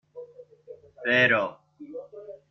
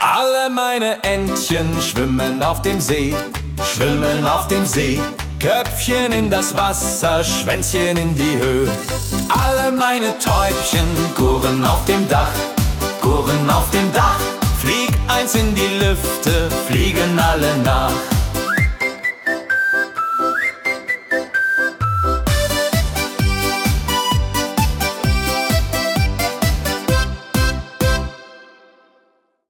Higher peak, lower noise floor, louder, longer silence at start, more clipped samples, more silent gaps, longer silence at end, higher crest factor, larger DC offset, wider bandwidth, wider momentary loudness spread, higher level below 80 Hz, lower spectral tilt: second, -10 dBFS vs -2 dBFS; second, -49 dBFS vs -61 dBFS; second, -23 LUFS vs -17 LUFS; first, 0.15 s vs 0 s; neither; neither; second, 0.2 s vs 1.05 s; about the same, 20 dB vs 16 dB; neither; second, 6.6 kHz vs 18 kHz; first, 25 LU vs 4 LU; second, -70 dBFS vs -26 dBFS; first, -5.5 dB/octave vs -4 dB/octave